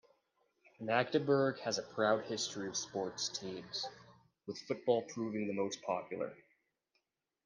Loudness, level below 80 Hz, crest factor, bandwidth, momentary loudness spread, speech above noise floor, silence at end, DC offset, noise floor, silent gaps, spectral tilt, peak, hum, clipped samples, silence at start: -37 LUFS; -82 dBFS; 22 dB; 10.5 kHz; 11 LU; 46 dB; 1.1 s; under 0.1%; -83 dBFS; none; -4 dB/octave; -16 dBFS; none; under 0.1%; 0.8 s